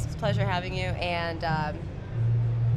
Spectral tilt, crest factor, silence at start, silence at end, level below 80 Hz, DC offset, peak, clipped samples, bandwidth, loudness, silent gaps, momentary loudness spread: -7 dB/octave; 14 dB; 0 s; 0 s; -42 dBFS; under 0.1%; -14 dBFS; under 0.1%; 8.8 kHz; -28 LUFS; none; 6 LU